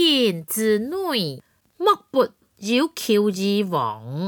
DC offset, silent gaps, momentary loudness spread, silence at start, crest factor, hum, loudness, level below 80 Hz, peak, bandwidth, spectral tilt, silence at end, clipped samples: under 0.1%; none; 7 LU; 0 s; 16 dB; none; -22 LUFS; -70 dBFS; -6 dBFS; over 20 kHz; -4.5 dB/octave; 0 s; under 0.1%